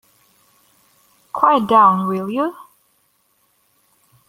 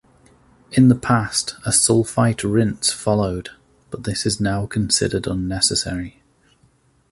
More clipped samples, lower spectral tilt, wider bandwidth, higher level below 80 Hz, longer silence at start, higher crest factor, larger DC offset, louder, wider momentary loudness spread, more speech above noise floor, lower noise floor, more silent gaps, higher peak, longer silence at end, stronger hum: neither; first, -7 dB/octave vs -4 dB/octave; first, 16 kHz vs 11.5 kHz; second, -64 dBFS vs -42 dBFS; first, 1.35 s vs 0.7 s; about the same, 20 dB vs 18 dB; neither; first, -16 LUFS vs -19 LUFS; about the same, 12 LU vs 13 LU; first, 48 dB vs 39 dB; first, -63 dBFS vs -58 dBFS; neither; about the same, -2 dBFS vs -2 dBFS; first, 1.75 s vs 1 s; neither